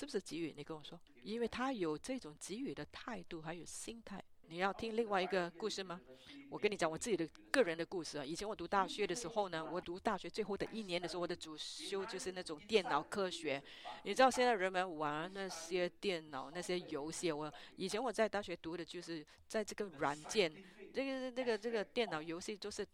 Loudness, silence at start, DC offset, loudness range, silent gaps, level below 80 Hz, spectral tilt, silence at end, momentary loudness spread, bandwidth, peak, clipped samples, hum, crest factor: -40 LUFS; 0 s; under 0.1%; 6 LU; none; -70 dBFS; -3.5 dB/octave; 0.1 s; 11 LU; 15.5 kHz; -16 dBFS; under 0.1%; none; 26 dB